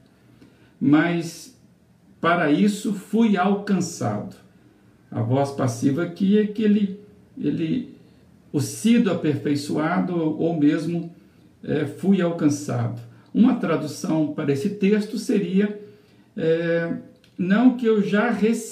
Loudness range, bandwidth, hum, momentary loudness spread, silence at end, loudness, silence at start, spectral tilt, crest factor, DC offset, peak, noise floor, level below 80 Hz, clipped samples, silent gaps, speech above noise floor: 2 LU; 15 kHz; none; 11 LU; 0 s; -22 LUFS; 0.8 s; -6.5 dB/octave; 18 dB; under 0.1%; -6 dBFS; -55 dBFS; -68 dBFS; under 0.1%; none; 34 dB